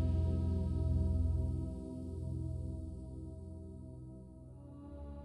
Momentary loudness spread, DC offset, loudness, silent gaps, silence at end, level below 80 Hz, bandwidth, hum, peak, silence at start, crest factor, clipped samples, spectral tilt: 18 LU; under 0.1%; -39 LUFS; none; 0 s; -42 dBFS; 4.9 kHz; none; -24 dBFS; 0 s; 14 dB; under 0.1%; -10 dB/octave